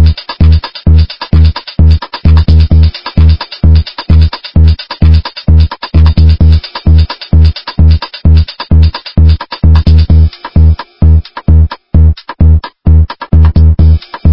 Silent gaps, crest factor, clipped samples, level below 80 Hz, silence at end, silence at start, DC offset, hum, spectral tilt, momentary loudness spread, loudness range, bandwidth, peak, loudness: none; 6 dB; 4%; -8 dBFS; 0 s; 0 s; 7%; none; -9.5 dB/octave; 4 LU; 1 LU; 5.6 kHz; 0 dBFS; -8 LUFS